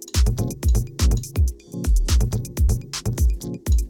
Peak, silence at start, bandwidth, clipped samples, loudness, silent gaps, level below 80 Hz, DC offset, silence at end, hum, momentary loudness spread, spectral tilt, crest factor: -8 dBFS; 0 s; 17.5 kHz; under 0.1%; -23 LUFS; none; -22 dBFS; under 0.1%; 0 s; none; 4 LU; -5 dB/octave; 12 dB